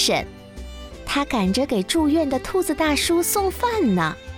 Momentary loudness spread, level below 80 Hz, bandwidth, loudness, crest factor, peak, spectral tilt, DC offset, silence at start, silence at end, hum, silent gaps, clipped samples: 18 LU; -40 dBFS; 17 kHz; -21 LUFS; 14 dB; -6 dBFS; -4 dB/octave; under 0.1%; 0 s; 0 s; none; none; under 0.1%